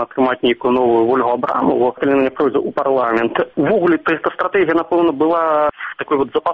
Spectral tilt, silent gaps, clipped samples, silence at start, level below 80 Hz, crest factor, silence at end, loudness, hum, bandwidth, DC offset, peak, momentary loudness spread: -8 dB/octave; none; under 0.1%; 0 s; -54 dBFS; 12 dB; 0 s; -16 LUFS; none; 5 kHz; under 0.1%; -4 dBFS; 4 LU